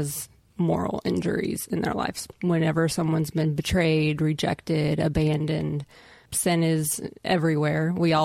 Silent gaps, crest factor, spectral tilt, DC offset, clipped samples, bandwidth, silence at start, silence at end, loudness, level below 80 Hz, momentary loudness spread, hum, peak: none; 14 dB; -5.5 dB/octave; under 0.1%; under 0.1%; 16 kHz; 0 s; 0 s; -25 LUFS; -48 dBFS; 7 LU; none; -10 dBFS